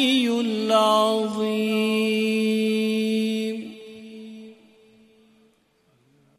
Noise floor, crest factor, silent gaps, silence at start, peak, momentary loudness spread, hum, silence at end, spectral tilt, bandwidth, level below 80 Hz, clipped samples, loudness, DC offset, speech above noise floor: -64 dBFS; 18 dB; none; 0 s; -6 dBFS; 22 LU; none; 1.85 s; -4.5 dB/octave; 15 kHz; -76 dBFS; under 0.1%; -22 LUFS; under 0.1%; 43 dB